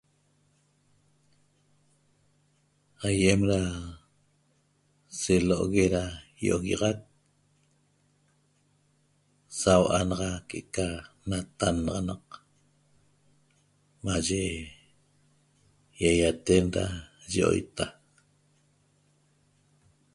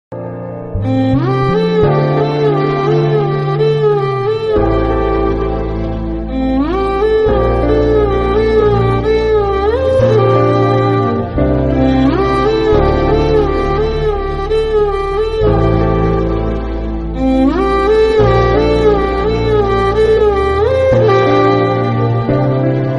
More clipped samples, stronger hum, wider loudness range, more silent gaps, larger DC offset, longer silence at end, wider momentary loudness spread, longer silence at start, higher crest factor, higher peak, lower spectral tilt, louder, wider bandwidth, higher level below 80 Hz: neither; neither; first, 7 LU vs 3 LU; neither; neither; first, 2.25 s vs 0 s; first, 16 LU vs 6 LU; first, 3 s vs 0.1 s; first, 26 dB vs 12 dB; second, -6 dBFS vs 0 dBFS; second, -5 dB/octave vs -8.5 dB/octave; second, -28 LUFS vs -13 LUFS; first, 11.5 kHz vs 7.4 kHz; second, -48 dBFS vs -22 dBFS